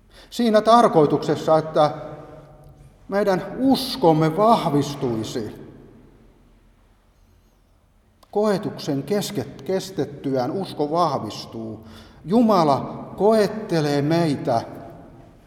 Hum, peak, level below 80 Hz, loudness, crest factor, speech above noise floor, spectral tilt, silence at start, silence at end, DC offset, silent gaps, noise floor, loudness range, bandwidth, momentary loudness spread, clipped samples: none; -2 dBFS; -54 dBFS; -21 LUFS; 20 dB; 38 dB; -6.5 dB/octave; 0.2 s; 0.25 s; under 0.1%; none; -58 dBFS; 9 LU; 17.5 kHz; 17 LU; under 0.1%